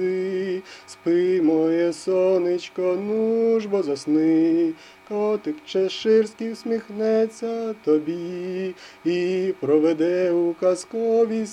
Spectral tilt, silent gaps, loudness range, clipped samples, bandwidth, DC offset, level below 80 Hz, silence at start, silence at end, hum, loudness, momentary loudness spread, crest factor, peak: -6 dB/octave; none; 3 LU; under 0.1%; 11 kHz; under 0.1%; -72 dBFS; 0 s; 0 s; none; -22 LUFS; 10 LU; 14 dB; -8 dBFS